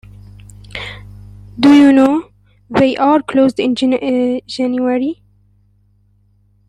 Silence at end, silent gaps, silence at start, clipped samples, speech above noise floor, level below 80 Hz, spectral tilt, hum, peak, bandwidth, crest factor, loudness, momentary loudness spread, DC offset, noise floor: 1.55 s; none; 0.75 s; under 0.1%; 42 dB; -46 dBFS; -6 dB/octave; 50 Hz at -45 dBFS; 0 dBFS; 10.5 kHz; 14 dB; -13 LUFS; 20 LU; under 0.1%; -54 dBFS